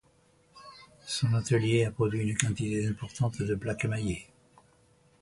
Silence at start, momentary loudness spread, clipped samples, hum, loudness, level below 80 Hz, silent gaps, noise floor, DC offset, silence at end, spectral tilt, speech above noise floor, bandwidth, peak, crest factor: 0.55 s; 16 LU; under 0.1%; none; -30 LUFS; -54 dBFS; none; -65 dBFS; under 0.1%; 1 s; -5.5 dB/octave; 36 dB; 11.5 kHz; -2 dBFS; 28 dB